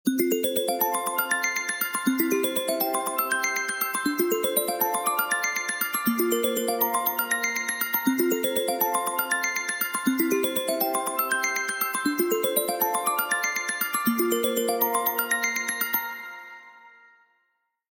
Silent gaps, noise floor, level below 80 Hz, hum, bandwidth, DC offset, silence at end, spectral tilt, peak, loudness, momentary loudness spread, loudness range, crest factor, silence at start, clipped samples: none; -74 dBFS; -76 dBFS; none; 17 kHz; under 0.1%; 1.05 s; -2 dB/octave; -10 dBFS; -25 LUFS; 2 LU; 1 LU; 16 dB; 0.05 s; under 0.1%